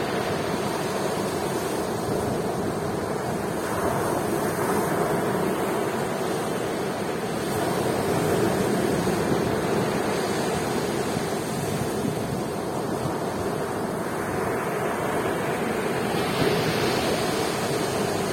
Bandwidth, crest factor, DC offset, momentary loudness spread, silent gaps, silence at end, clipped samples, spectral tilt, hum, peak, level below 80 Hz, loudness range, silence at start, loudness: 16.5 kHz; 18 dB; under 0.1%; 4 LU; none; 0 s; under 0.1%; -5 dB/octave; none; -8 dBFS; -52 dBFS; 3 LU; 0 s; -26 LUFS